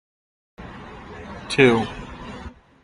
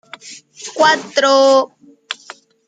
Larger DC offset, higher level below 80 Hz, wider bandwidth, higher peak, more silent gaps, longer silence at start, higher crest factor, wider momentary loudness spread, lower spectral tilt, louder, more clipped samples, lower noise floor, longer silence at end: neither; first, -46 dBFS vs -70 dBFS; first, 10.5 kHz vs 9.2 kHz; about the same, -2 dBFS vs -2 dBFS; neither; first, 0.6 s vs 0.25 s; first, 22 dB vs 16 dB; about the same, 24 LU vs 23 LU; first, -5.5 dB/octave vs -1.5 dB/octave; second, -19 LUFS vs -13 LUFS; neither; about the same, -40 dBFS vs -41 dBFS; second, 0.35 s vs 0.55 s